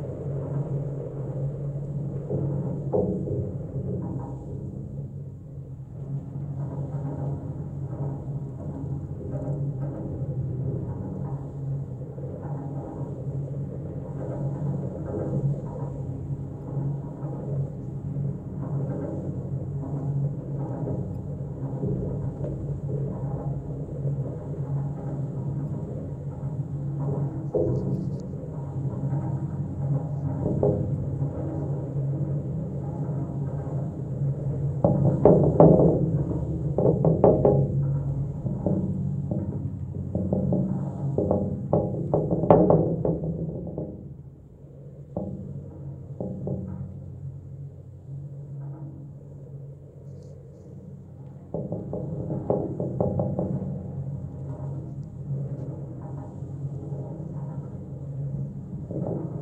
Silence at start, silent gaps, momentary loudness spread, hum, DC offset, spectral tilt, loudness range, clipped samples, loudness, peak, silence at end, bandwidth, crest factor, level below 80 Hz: 0 s; none; 14 LU; none; under 0.1%; -12 dB/octave; 14 LU; under 0.1%; -28 LUFS; 0 dBFS; 0 s; 2.2 kHz; 28 dB; -46 dBFS